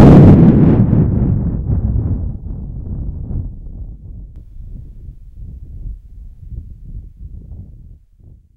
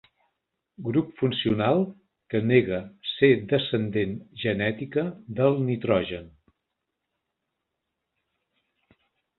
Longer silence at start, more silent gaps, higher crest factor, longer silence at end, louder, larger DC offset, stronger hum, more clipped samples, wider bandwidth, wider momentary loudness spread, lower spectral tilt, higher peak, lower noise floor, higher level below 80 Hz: second, 0 s vs 0.8 s; neither; second, 14 dB vs 22 dB; second, 0.95 s vs 3.1 s; first, -12 LUFS vs -25 LUFS; neither; neither; first, 0.6% vs under 0.1%; first, 5.2 kHz vs 4.3 kHz; first, 28 LU vs 10 LU; about the same, -11 dB/octave vs -10.5 dB/octave; first, 0 dBFS vs -6 dBFS; second, -43 dBFS vs -82 dBFS; first, -24 dBFS vs -58 dBFS